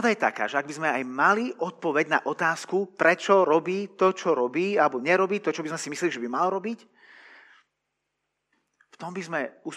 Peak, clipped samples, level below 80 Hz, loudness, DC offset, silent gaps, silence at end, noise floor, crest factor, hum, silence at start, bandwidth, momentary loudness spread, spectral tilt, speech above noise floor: -6 dBFS; under 0.1%; -88 dBFS; -25 LUFS; under 0.1%; none; 0 s; -81 dBFS; 20 dB; 50 Hz at -70 dBFS; 0 s; 12.5 kHz; 9 LU; -4.5 dB/octave; 56 dB